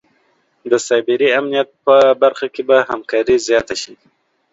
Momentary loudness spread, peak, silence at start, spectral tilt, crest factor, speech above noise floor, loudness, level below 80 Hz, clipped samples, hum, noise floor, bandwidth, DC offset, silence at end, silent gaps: 12 LU; 0 dBFS; 0.65 s; -3 dB/octave; 16 dB; 46 dB; -15 LUFS; -54 dBFS; under 0.1%; none; -60 dBFS; 8 kHz; under 0.1%; 0.6 s; none